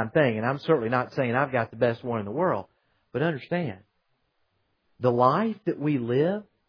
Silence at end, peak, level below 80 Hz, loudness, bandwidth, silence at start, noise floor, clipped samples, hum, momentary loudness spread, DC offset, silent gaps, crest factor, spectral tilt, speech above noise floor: 0.25 s; -6 dBFS; -68 dBFS; -26 LUFS; 5.4 kHz; 0 s; -73 dBFS; under 0.1%; none; 8 LU; under 0.1%; none; 20 dB; -9 dB/octave; 48 dB